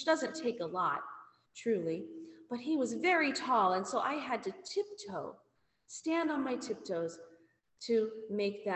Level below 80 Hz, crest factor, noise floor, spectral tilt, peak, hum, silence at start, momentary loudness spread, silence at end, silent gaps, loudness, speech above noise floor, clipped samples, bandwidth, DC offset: -80 dBFS; 18 dB; -66 dBFS; -4 dB/octave; -18 dBFS; none; 0 s; 18 LU; 0 s; none; -35 LUFS; 32 dB; under 0.1%; 8.4 kHz; under 0.1%